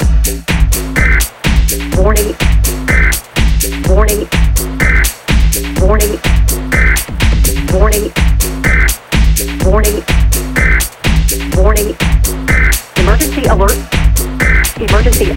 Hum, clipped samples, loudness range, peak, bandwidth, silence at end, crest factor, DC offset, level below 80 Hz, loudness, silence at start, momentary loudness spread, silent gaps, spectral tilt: none; 0.2%; 0 LU; 0 dBFS; 17 kHz; 0 s; 10 dB; under 0.1%; -12 dBFS; -12 LUFS; 0 s; 3 LU; none; -4.5 dB/octave